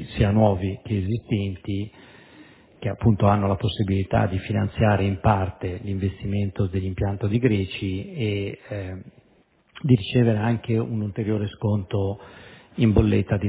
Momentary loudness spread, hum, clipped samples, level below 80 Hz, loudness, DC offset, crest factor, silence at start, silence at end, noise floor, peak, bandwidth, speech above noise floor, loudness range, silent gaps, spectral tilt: 12 LU; none; under 0.1%; -38 dBFS; -24 LUFS; under 0.1%; 20 dB; 0 s; 0 s; -60 dBFS; -2 dBFS; 4 kHz; 38 dB; 3 LU; none; -12 dB/octave